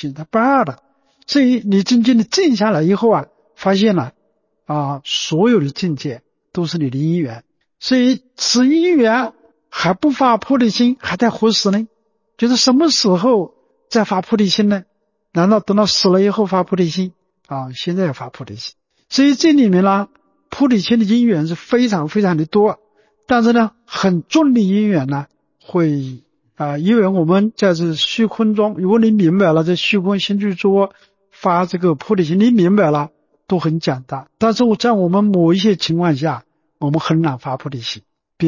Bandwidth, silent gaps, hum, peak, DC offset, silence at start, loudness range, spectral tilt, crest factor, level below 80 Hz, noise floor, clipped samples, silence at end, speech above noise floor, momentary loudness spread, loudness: 7.4 kHz; none; none; -2 dBFS; under 0.1%; 0 s; 3 LU; -5.5 dB/octave; 14 dB; -58 dBFS; -64 dBFS; under 0.1%; 0 s; 50 dB; 12 LU; -15 LUFS